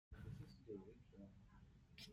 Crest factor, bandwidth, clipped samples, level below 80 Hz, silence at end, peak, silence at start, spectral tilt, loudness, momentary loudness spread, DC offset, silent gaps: 16 dB; 15.5 kHz; under 0.1%; -68 dBFS; 0 s; -42 dBFS; 0.1 s; -6.5 dB/octave; -60 LUFS; 11 LU; under 0.1%; none